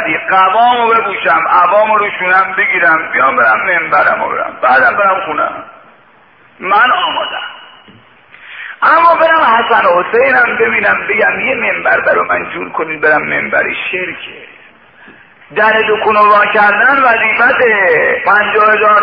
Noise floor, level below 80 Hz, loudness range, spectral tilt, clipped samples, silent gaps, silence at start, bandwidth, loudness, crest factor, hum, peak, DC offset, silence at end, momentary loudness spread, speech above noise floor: -45 dBFS; -52 dBFS; 6 LU; -6.5 dB/octave; under 0.1%; none; 0 s; 5.2 kHz; -10 LUFS; 10 dB; none; 0 dBFS; 0.2%; 0 s; 10 LU; 34 dB